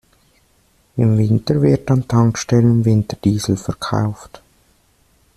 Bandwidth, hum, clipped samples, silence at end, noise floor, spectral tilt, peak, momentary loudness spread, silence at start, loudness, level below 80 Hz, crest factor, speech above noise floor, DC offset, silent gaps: 12.5 kHz; none; under 0.1%; 1.1 s; -57 dBFS; -7 dB/octave; -2 dBFS; 8 LU; 0.95 s; -17 LUFS; -46 dBFS; 14 dB; 42 dB; under 0.1%; none